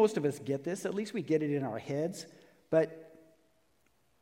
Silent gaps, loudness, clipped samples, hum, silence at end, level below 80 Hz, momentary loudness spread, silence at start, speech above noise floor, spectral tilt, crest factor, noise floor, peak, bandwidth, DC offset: none; -33 LUFS; under 0.1%; none; 1.15 s; -80 dBFS; 9 LU; 0 s; 41 dB; -6.5 dB/octave; 20 dB; -73 dBFS; -14 dBFS; 16.5 kHz; under 0.1%